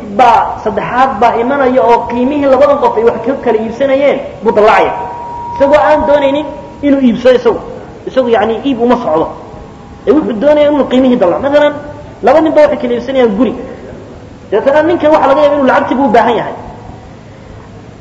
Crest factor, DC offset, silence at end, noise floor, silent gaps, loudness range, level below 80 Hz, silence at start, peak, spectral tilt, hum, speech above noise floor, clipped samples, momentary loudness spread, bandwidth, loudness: 10 dB; under 0.1%; 0.05 s; -31 dBFS; none; 2 LU; -38 dBFS; 0 s; 0 dBFS; -6.5 dB/octave; none; 23 dB; 1%; 15 LU; 8 kHz; -10 LUFS